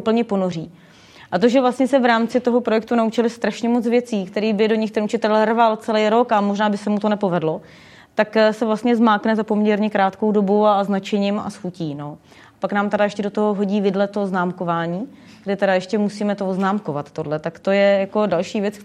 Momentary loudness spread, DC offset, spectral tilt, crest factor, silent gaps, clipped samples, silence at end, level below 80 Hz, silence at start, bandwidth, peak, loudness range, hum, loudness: 10 LU; under 0.1%; -6.5 dB/octave; 16 dB; none; under 0.1%; 0 s; -66 dBFS; 0 s; 10.5 kHz; -2 dBFS; 4 LU; none; -19 LUFS